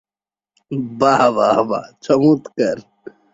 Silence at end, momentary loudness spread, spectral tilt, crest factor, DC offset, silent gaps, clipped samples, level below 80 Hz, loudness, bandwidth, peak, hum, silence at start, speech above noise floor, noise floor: 0.55 s; 12 LU; -6.5 dB/octave; 16 dB; under 0.1%; none; under 0.1%; -60 dBFS; -17 LUFS; 8 kHz; -2 dBFS; none; 0.7 s; over 74 dB; under -90 dBFS